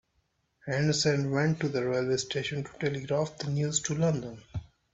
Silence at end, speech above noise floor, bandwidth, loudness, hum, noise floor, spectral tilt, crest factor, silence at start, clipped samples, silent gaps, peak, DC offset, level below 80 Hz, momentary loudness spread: 0.3 s; 45 dB; 8.2 kHz; -29 LUFS; none; -74 dBFS; -5 dB/octave; 16 dB; 0.65 s; under 0.1%; none; -14 dBFS; under 0.1%; -60 dBFS; 13 LU